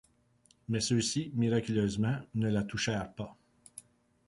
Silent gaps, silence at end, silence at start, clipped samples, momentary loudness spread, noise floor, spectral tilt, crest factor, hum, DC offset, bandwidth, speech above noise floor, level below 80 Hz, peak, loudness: none; 0.45 s; 0.7 s; under 0.1%; 21 LU; -68 dBFS; -5 dB/octave; 16 dB; none; under 0.1%; 11.5 kHz; 36 dB; -58 dBFS; -18 dBFS; -32 LUFS